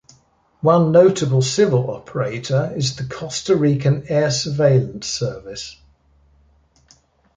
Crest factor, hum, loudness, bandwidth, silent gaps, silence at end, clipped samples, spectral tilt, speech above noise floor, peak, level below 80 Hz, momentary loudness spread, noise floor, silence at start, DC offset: 18 dB; none; -18 LUFS; 9.4 kHz; none; 1.65 s; under 0.1%; -5.5 dB/octave; 39 dB; -2 dBFS; -52 dBFS; 13 LU; -57 dBFS; 0.65 s; under 0.1%